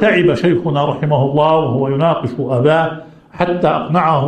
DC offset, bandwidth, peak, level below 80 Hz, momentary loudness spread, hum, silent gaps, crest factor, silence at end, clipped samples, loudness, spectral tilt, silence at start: under 0.1%; 8.8 kHz; 0 dBFS; -50 dBFS; 6 LU; none; none; 14 dB; 0 s; under 0.1%; -15 LUFS; -8 dB/octave; 0 s